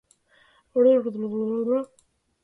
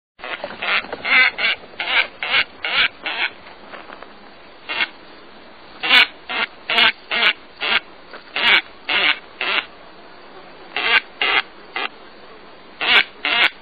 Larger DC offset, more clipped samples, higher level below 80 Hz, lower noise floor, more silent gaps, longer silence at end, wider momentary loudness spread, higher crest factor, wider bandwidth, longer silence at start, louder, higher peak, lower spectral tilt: second, under 0.1% vs 0.4%; neither; second, -72 dBFS vs -58 dBFS; first, -60 dBFS vs -43 dBFS; neither; first, 0.6 s vs 0.1 s; second, 10 LU vs 15 LU; about the same, 16 dB vs 20 dB; second, 3.7 kHz vs 16 kHz; first, 0.75 s vs 0.2 s; second, -24 LUFS vs -17 LUFS; second, -8 dBFS vs 0 dBFS; first, -8.5 dB/octave vs -2 dB/octave